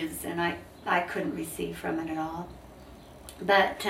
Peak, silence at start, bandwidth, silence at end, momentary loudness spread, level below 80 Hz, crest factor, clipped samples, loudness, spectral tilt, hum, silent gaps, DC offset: -10 dBFS; 0 s; 16 kHz; 0 s; 24 LU; -56 dBFS; 22 dB; under 0.1%; -30 LUFS; -4 dB/octave; none; none; under 0.1%